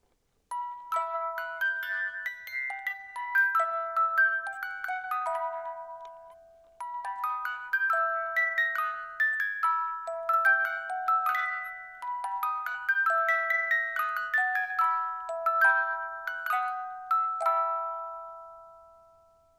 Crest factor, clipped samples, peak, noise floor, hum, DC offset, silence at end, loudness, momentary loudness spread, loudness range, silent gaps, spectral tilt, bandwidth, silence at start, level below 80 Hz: 18 dB; under 0.1%; -12 dBFS; -72 dBFS; none; under 0.1%; 0.7 s; -28 LUFS; 13 LU; 5 LU; none; 0.5 dB/octave; 15 kHz; 0.5 s; -76 dBFS